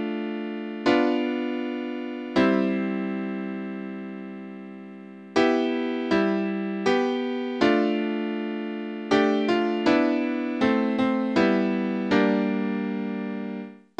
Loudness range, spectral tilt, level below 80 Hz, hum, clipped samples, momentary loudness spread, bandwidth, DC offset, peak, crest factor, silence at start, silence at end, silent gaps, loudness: 5 LU; -6.5 dB/octave; -62 dBFS; none; under 0.1%; 13 LU; 8.6 kHz; under 0.1%; -6 dBFS; 18 dB; 0 s; 0.25 s; none; -25 LUFS